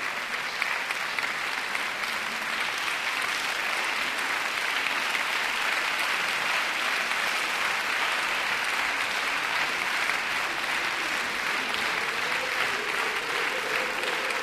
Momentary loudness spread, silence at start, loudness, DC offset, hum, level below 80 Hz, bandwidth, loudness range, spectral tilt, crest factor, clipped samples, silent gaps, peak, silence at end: 3 LU; 0 s; -26 LUFS; under 0.1%; none; -64 dBFS; 15.5 kHz; 2 LU; 0 dB/octave; 18 dB; under 0.1%; none; -10 dBFS; 0 s